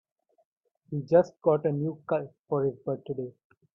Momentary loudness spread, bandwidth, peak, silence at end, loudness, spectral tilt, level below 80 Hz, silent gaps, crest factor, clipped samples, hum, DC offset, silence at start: 13 LU; 7 kHz; -10 dBFS; 0.45 s; -29 LUFS; -9.5 dB/octave; -70 dBFS; 2.39-2.44 s; 20 dB; under 0.1%; none; under 0.1%; 0.9 s